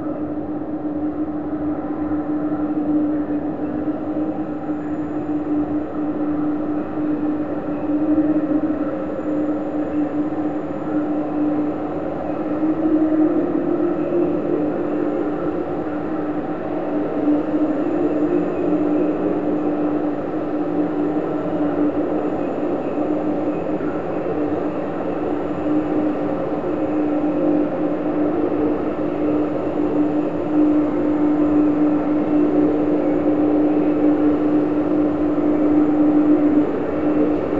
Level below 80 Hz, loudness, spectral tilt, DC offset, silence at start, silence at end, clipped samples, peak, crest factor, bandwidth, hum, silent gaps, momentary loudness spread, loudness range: -46 dBFS; -20 LUFS; -9.5 dB/octave; 2%; 0 s; 0 s; under 0.1%; -6 dBFS; 14 dB; 4.1 kHz; none; none; 7 LU; 5 LU